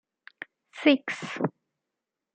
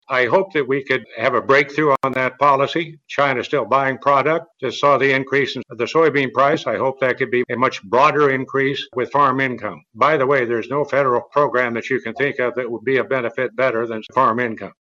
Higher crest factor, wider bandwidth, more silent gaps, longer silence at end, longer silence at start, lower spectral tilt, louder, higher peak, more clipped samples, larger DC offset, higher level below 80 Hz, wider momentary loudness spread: first, 24 dB vs 16 dB; first, 8.8 kHz vs 7.6 kHz; neither; first, 0.85 s vs 0.2 s; first, 0.75 s vs 0.1 s; about the same, -5.5 dB/octave vs -6 dB/octave; second, -27 LUFS vs -18 LUFS; second, -6 dBFS vs -2 dBFS; neither; neither; second, -80 dBFS vs -68 dBFS; first, 21 LU vs 7 LU